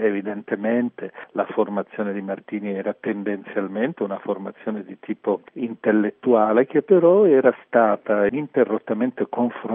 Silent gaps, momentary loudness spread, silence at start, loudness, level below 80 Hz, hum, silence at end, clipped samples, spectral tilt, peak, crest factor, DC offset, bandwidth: none; 13 LU; 0 s; -22 LUFS; -70 dBFS; none; 0 s; under 0.1%; -6.5 dB/octave; -2 dBFS; 18 dB; under 0.1%; 3.7 kHz